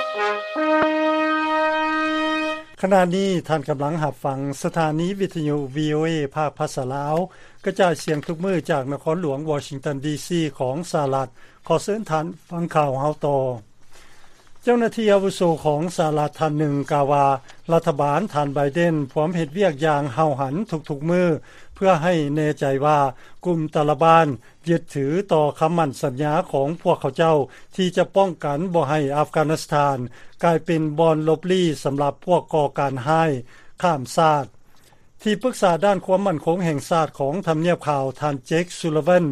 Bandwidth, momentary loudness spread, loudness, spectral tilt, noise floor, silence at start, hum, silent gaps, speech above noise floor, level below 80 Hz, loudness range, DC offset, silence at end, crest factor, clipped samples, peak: 14 kHz; 7 LU; -21 LUFS; -6.5 dB/octave; -49 dBFS; 0 s; none; none; 28 dB; -54 dBFS; 4 LU; under 0.1%; 0 s; 20 dB; under 0.1%; -2 dBFS